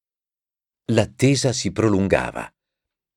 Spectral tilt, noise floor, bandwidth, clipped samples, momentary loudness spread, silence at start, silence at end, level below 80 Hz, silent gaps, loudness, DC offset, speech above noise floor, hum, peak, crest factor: -5.5 dB/octave; under -90 dBFS; 16 kHz; under 0.1%; 16 LU; 0.9 s; 0.7 s; -48 dBFS; none; -20 LUFS; under 0.1%; over 70 dB; none; -2 dBFS; 20 dB